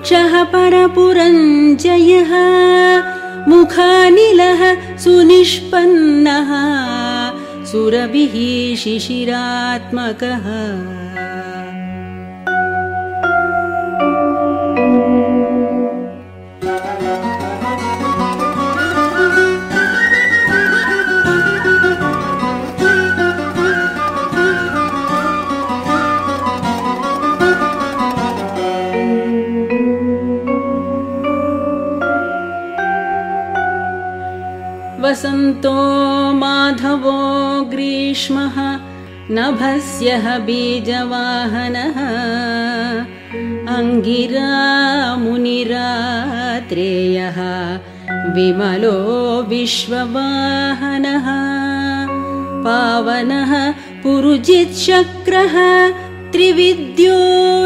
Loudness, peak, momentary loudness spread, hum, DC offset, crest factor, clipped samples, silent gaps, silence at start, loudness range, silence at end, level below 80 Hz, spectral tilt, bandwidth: -14 LUFS; 0 dBFS; 11 LU; none; under 0.1%; 14 dB; under 0.1%; none; 0 s; 9 LU; 0 s; -50 dBFS; -5 dB/octave; 13.5 kHz